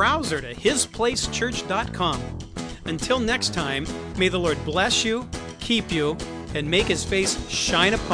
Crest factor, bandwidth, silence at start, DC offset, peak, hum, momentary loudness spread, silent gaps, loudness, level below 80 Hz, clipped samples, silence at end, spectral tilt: 22 dB; 11 kHz; 0 s; under 0.1%; -2 dBFS; none; 11 LU; none; -23 LUFS; -40 dBFS; under 0.1%; 0 s; -3 dB/octave